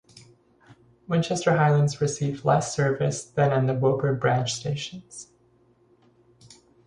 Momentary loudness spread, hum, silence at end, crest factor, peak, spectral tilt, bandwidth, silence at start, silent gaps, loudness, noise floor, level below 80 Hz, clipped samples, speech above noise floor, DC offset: 11 LU; none; 1.65 s; 18 dB; -8 dBFS; -5.5 dB/octave; 11 kHz; 0.15 s; none; -24 LUFS; -61 dBFS; -60 dBFS; under 0.1%; 38 dB; under 0.1%